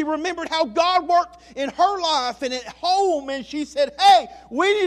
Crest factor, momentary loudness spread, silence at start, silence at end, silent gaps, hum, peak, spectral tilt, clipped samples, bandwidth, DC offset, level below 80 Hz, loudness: 16 dB; 13 LU; 0 s; 0 s; none; none; -4 dBFS; -2 dB/octave; under 0.1%; 12.5 kHz; under 0.1%; -56 dBFS; -20 LUFS